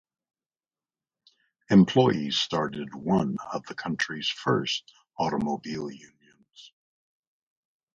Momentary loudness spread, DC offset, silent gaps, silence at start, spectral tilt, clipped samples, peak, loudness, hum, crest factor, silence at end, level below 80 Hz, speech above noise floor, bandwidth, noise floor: 14 LU; under 0.1%; none; 1.7 s; -5.5 dB/octave; under 0.1%; -8 dBFS; -26 LUFS; none; 22 dB; 1.25 s; -62 dBFS; over 64 dB; 7.6 kHz; under -90 dBFS